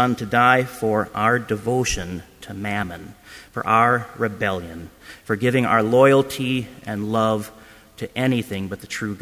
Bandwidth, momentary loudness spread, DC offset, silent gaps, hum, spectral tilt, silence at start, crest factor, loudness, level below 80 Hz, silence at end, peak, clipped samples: 16 kHz; 19 LU; under 0.1%; none; none; -5.5 dB/octave; 0 s; 20 dB; -21 LUFS; -46 dBFS; 0.05 s; -2 dBFS; under 0.1%